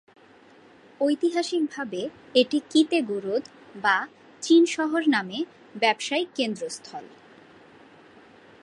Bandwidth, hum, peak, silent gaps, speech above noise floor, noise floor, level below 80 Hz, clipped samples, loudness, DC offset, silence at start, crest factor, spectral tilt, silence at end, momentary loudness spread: 11 kHz; none; -6 dBFS; none; 29 dB; -53 dBFS; -78 dBFS; under 0.1%; -25 LUFS; under 0.1%; 1 s; 20 dB; -3.5 dB/octave; 1.55 s; 14 LU